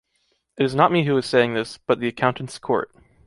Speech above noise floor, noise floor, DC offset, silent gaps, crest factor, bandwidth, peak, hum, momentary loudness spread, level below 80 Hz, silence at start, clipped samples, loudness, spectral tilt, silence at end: 48 dB; -69 dBFS; under 0.1%; none; 20 dB; 11.5 kHz; -2 dBFS; none; 8 LU; -60 dBFS; 0.55 s; under 0.1%; -21 LUFS; -6 dB/octave; 0.4 s